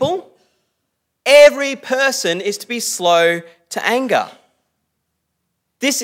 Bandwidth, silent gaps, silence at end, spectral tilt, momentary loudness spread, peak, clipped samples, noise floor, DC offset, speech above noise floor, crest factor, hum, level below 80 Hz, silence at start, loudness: 16.5 kHz; none; 0 s; -2 dB/octave; 15 LU; 0 dBFS; under 0.1%; -73 dBFS; under 0.1%; 55 dB; 18 dB; none; -64 dBFS; 0 s; -15 LUFS